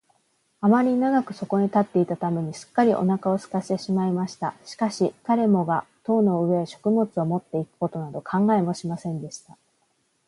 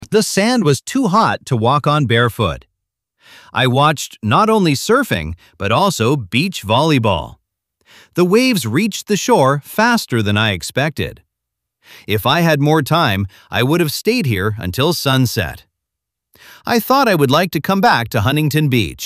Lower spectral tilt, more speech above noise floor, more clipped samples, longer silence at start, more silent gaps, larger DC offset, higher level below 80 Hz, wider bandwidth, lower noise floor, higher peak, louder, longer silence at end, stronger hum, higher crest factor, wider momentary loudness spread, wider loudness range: first, -7.5 dB/octave vs -5 dB/octave; second, 46 dB vs 65 dB; neither; first, 0.6 s vs 0 s; neither; neither; second, -68 dBFS vs -44 dBFS; second, 11.5 kHz vs 16 kHz; second, -69 dBFS vs -80 dBFS; second, -6 dBFS vs 0 dBFS; second, -24 LUFS vs -15 LUFS; first, 0.9 s vs 0 s; neither; about the same, 18 dB vs 16 dB; about the same, 9 LU vs 8 LU; about the same, 3 LU vs 2 LU